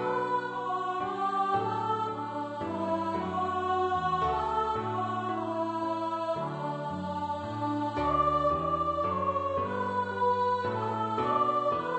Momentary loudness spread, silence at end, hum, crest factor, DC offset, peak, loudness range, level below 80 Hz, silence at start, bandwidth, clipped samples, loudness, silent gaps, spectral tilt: 7 LU; 0 s; none; 14 dB; under 0.1%; -16 dBFS; 3 LU; -54 dBFS; 0 s; 8.4 kHz; under 0.1%; -30 LUFS; none; -7 dB/octave